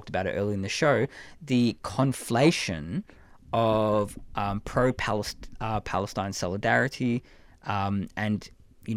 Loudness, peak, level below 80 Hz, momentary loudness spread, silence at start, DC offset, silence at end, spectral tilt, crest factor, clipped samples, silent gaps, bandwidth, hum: -27 LUFS; -10 dBFS; -48 dBFS; 10 LU; 0 s; under 0.1%; 0 s; -5.5 dB/octave; 18 dB; under 0.1%; none; 15.5 kHz; none